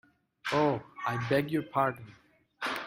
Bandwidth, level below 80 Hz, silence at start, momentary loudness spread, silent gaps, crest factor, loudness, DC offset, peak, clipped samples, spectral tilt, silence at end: 16 kHz; -68 dBFS; 0.45 s; 9 LU; none; 18 dB; -31 LUFS; under 0.1%; -14 dBFS; under 0.1%; -6 dB/octave; 0 s